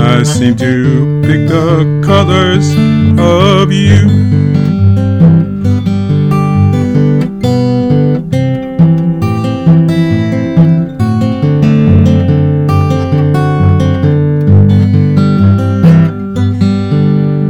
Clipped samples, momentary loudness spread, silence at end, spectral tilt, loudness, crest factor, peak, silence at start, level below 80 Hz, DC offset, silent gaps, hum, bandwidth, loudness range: 3%; 5 LU; 0 s; -7.5 dB/octave; -9 LUFS; 8 dB; 0 dBFS; 0 s; -34 dBFS; under 0.1%; none; none; 9.4 kHz; 2 LU